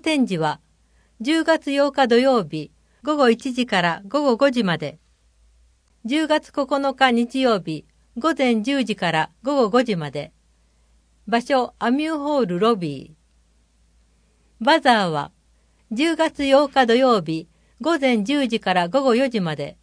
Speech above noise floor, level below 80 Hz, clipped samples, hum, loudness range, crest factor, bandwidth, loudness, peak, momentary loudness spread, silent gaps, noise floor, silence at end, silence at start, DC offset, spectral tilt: 40 dB; -58 dBFS; under 0.1%; none; 4 LU; 20 dB; 10.5 kHz; -20 LUFS; -2 dBFS; 13 LU; none; -60 dBFS; 0.1 s; 0.05 s; under 0.1%; -5 dB/octave